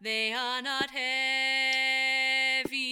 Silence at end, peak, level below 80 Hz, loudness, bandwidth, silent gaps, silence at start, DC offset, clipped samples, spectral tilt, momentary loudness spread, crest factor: 0 s; -14 dBFS; -72 dBFS; -26 LUFS; 18 kHz; none; 0 s; under 0.1%; under 0.1%; -0.5 dB/octave; 5 LU; 14 dB